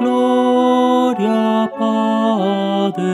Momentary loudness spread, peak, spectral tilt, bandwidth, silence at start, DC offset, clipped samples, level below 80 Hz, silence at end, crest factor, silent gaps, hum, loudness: 4 LU; -2 dBFS; -6.5 dB/octave; 12 kHz; 0 s; under 0.1%; under 0.1%; -72 dBFS; 0 s; 12 dB; none; none; -15 LUFS